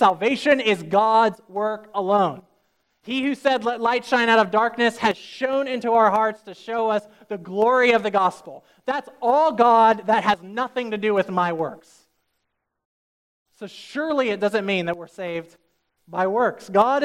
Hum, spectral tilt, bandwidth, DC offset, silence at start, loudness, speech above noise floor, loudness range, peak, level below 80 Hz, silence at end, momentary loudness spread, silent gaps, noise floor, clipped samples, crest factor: none; -5 dB/octave; 14 kHz; under 0.1%; 0 s; -21 LUFS; 55 dB; 7 LU; -4 dBFS; -68 dBFS; 0 s; 13 LU; 12.85-13.46 s; -76 dBFS; under 0.1%; 18 dB